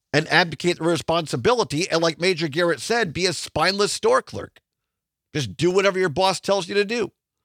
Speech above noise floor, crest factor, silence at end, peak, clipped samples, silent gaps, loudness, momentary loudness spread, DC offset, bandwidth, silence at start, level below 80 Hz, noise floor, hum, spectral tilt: 62 dB; 22 dB; 0.35 s; 0 dBFS; under 0.1%; none; -21 LUFS; 9 LU; under 0.1%; 16 kHz; 0.15 s; -56 dBFS; -83 dBFS; none; -4 dB/octave